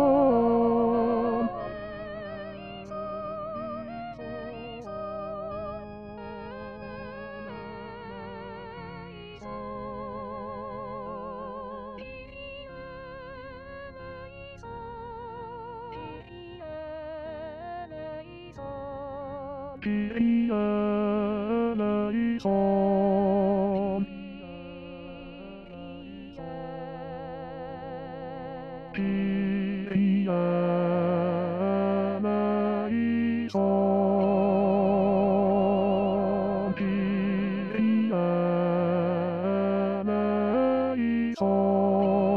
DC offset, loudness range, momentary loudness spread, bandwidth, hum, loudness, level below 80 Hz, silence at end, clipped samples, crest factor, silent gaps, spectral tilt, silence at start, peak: 0.1%; 15 LU; 18 LU; 5.8 kHz; none; -27 LUFS; -56 dBFS; 0 s; under 0.1%; 16 dB; none; -9.5 dB/octave; 0 s; -12 dBFS